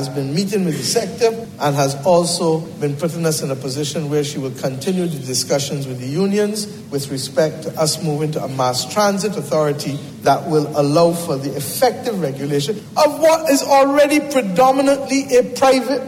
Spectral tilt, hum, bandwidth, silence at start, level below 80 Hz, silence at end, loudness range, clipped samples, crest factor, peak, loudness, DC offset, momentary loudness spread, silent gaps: -4.5 dB/octave; none; 16.5 kHz; 0 s; -58 dBFS; 0 s; 5 LU; under 0.1%; 14 dB; -4 dBFS; -18 LUFS; under 0.1%; 9 LU; none